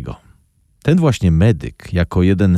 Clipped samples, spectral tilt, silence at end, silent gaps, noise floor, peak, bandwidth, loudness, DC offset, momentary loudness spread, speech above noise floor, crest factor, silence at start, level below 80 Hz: under 0.1%; -8 dB/octave; 0 s; none; -56 dBFS; -4 dBFS; 11.5 kHz; -16 LUFS; under 0.1%; 9 LU; 42 dB; 12 dB; 0 s; -32 dBFS